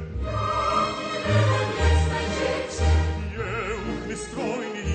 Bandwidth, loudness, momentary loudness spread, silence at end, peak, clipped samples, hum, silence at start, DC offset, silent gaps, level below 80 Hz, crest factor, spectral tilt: 9 kHz; -25 LUFS; 8 LU; 0 s; -10 dBFS; under 0.1%; none; 0 s; under 0.1%; none; -30 dBFS; 14 dB; -5.5 dB/octave